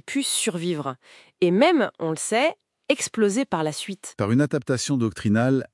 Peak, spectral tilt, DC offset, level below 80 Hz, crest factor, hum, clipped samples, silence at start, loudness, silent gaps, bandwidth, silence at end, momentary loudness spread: -4 dBFS; -4.5 dB/octave; under 0.1%; -64 dBFS; 18 dB; none; under 0.1%; 0.05 s; -23 LUFS; none; 12 kHz; 0.1 s; 10 LU